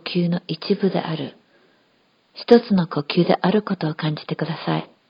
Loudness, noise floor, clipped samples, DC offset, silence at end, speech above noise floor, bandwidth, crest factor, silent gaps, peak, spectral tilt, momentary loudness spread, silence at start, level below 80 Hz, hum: -21 LUFS; -62 dBFS; under 0.1%; under 0.1%; 0.25 s; 41 dB; 5.4 kHz; 20 dB; none; 0 dBFS; -9 dB/octave; 11 LU; 0.05 s; -66 dBFS; none